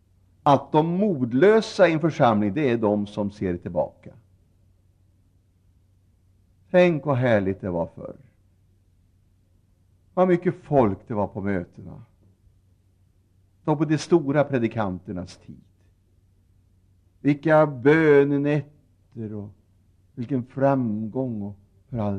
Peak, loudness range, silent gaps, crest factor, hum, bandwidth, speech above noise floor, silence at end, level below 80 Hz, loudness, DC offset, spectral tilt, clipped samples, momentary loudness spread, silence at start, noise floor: -4 dBFS; 8 LU; none; 20 dB; none; 10 kHz; 39 dB; 0 s; -60 dBFS; -22 LUFS; under 0.1%; -7.5 dB/octave; under 0.1%; 17 LU; 0.45 s; -61 dBFS